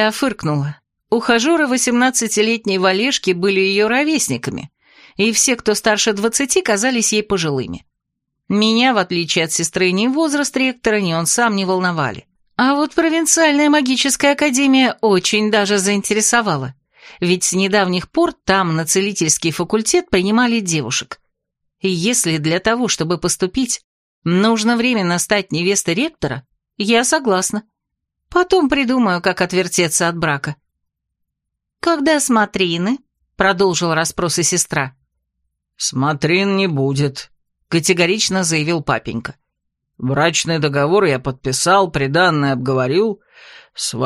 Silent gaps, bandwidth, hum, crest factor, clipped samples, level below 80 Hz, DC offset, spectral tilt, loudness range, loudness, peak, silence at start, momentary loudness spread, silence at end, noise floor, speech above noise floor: 23.84-24.22 s; 15.5 kHz; none; 16 dB; under 0.1%; -50 dBFS; under 0.1%; -3.5 dB/octave; 4 LU; -16 LUFS; 0 dBFS; 0 s; 8 LU; 0 s; -79 dBFS; 63 dB